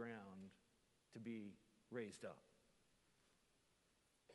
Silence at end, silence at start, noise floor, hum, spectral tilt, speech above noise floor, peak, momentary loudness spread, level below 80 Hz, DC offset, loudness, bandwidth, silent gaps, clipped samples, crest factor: 0 s; 0 s; -81 dBFS; none; -5.5 dB/octave; 28 dB; -36 dBFS; 12 LU; -90 dBFS; under 0.1%; -56 LUFS; 11.5 kHz; none; under 0.1%; 22 dB